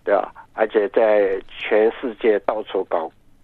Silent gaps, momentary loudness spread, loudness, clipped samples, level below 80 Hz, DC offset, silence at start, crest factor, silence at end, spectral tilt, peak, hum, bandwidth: none; 9 LU; -20 LUFS; under 0.1%; -54 dBFS; under 0.1%; 0.05 s; 16 dB; 0.35 s; -7 dB/octave; -4 dBFS; none; 4.3 kHz